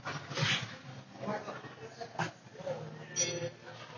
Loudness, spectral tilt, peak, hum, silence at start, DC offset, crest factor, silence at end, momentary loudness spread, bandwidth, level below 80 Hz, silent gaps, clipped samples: -37 LUFS; -2.5 dB/octave; -20 dBFS; none; 0 s; under 0.1%; 20 dB; 0 s; 16 LU; 7.4 kHz; -72 dBFS; none; under 0.1%